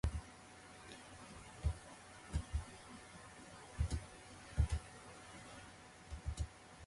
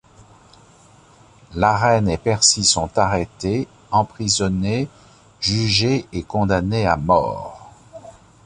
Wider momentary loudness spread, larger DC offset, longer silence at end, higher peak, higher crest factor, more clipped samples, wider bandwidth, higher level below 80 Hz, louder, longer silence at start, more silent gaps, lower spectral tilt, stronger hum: first, 15 LU vs 10 LU; neither; second, 0 s vs 0.35 s; second, -22 dBFS vs -2 dBFS; about the same, 22 dB vs 18 dB; neither; about the same, 11.5 kHz vs 11 kHz; second, -46 dBFS vs -40 dBFS; second, -47 LUFS vs -19 LUFS; second, 0.05 s vs 1.5 s; neither; about the same, -5 dB/octave vs -4 dB/octave; neither